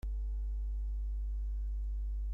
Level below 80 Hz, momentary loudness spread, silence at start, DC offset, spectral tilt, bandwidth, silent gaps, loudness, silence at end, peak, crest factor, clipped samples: -36 dBFS; 0 LU; 0.05 s; under 0.1%; -9 dB/octave; 0.9 kHz; none; -41 LUFS; 0 s; -32 dBFS; 4 dB; under 0.1%